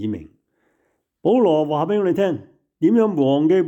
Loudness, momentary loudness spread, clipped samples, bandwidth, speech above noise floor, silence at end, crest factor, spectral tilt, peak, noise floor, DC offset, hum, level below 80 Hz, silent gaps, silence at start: -19 LUFS; 11 LU; under 0.1%; 8 kHz; 51 dB; 0 s; 12 dB; -8.5 dB/octave; -6 dBFS; -69 dBFS; under 0.1%; none; -64 dBFS; none; 0 s